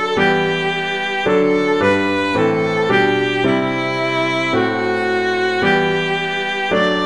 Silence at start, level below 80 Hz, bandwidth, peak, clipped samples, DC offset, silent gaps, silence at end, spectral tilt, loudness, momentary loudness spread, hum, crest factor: 0 s; -52 dBFS; 11 kHz; -2 dBFS; under 0.1%; 0.6%; none; 0 s; -5.5 dB/octave; -16 LUFS; 4 LU; none; 14 dB